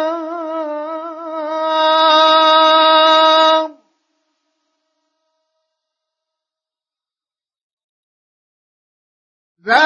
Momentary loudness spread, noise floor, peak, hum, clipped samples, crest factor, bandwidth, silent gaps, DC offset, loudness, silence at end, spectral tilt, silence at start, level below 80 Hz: 17 LU; under -90 dBFS; 0 dBFS; none; under 0.1%; 16 dB; 7.4 kHz; 7.62-7.77 s, 7.84-9.55 s; under 0.1%; -12 LUFS; 0 s; -1.5 dB/octave; 0 s; -82 dBFS